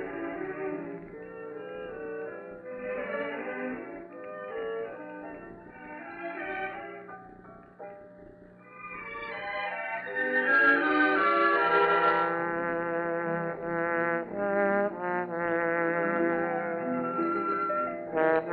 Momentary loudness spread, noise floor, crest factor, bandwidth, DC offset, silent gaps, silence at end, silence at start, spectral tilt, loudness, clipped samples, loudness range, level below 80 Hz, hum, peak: 19 LU; -51 dBFS; 20 dB; 5 kHz; under 0.1%; none; 0 s; 0 s; -9 dB/octave; -29 LUFS; under 0.1%; 16 LU; -66 dBFS; none; -12 dBFS